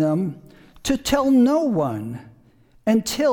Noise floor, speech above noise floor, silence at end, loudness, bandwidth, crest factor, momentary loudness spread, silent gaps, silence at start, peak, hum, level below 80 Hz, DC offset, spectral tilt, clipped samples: -54 dBFS; 34 dB; 0 s; -21 LUFS; 19 kHz; 16 dB; 14 LU; none; 0 s; -4 dBFS; none; -46 dBFS; under 0.1%; -5.5 dB/octave; under 0.1%